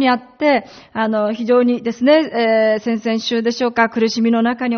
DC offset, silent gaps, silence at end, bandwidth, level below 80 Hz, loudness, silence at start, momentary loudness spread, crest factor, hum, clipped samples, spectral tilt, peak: under 0.1%; none; 0 s; 6.6 kHz; -62 dBFS; -16 LUFS; 0 s; 5 LU; 16 dB; none; under 0.1%; -3 dB/octave; 0 dBFS